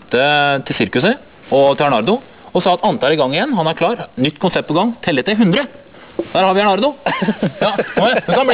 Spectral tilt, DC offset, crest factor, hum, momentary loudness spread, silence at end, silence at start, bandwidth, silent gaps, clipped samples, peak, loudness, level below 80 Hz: -9.5 dB/octave; 0.3%; 12 dB; none; 6 LU; 0 s; 0.1 s; 4 kHz; none; under 0.1%; -4 dBFS; -15 LUFS; -52 dBFS